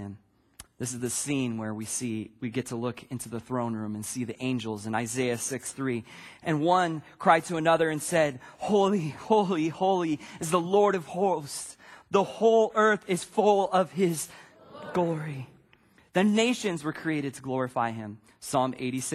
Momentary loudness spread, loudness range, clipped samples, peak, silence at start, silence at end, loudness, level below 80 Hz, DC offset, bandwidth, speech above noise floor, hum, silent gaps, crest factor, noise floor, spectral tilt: 13 LU; 7 LU; under 0.1%; -6 dBFS; 0 s; 0 s; -28 LUFS; -66 dBFS; under 0.1%; 15.5 kHz; 34 dB; none; none; 22 dB; -61 dBFS; -5 dB/octave